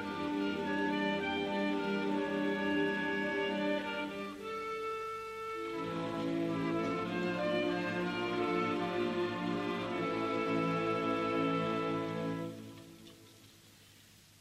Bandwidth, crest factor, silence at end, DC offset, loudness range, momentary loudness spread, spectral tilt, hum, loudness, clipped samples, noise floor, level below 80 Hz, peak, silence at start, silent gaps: 14.5 kHz; 14 dB; 0.5 s; under 0.1%; 4 LU; 8 LU; -6 dB/octave; 50 Hz at -65 dBFS; -35 LUFS; under 0.1%; -60 dBFS; -68 dBFS; -20 dBFS; 0 s; none